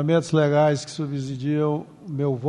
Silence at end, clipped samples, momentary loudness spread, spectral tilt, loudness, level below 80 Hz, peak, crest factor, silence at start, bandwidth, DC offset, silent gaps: 0 s; under 0.1%; 10 LU; -7 dB/octave; -23 LUFS; -64 dBFS; -8 dBFS; 14 dB; 0 s; 10.5 kHz; under 0.1%; none